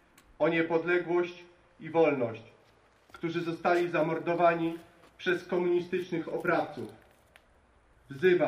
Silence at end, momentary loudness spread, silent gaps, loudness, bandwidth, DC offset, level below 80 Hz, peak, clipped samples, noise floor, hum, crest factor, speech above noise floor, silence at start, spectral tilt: 0 s; 15 LU; none; -30 LUFS; 10.5 kHz; under 0.1%; -70 dBFS; -12 dBFS; under 0.1%; -63 dBFS; none; 18 dB; 35 dB; 0.4 s; -7 dB/octave